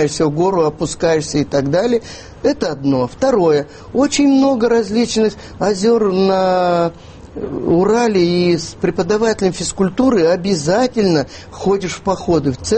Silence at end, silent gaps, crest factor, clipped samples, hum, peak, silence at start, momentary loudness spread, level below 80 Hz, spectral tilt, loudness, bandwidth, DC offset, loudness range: 0 s; none; 12 dB; under 0.1%; none; -2 dBFS; 0 s; 7 LU; -42 dBFS; -5.5 dB/octave; -16 LUFS; 8.8 kHz; under 0.1%; 2 LU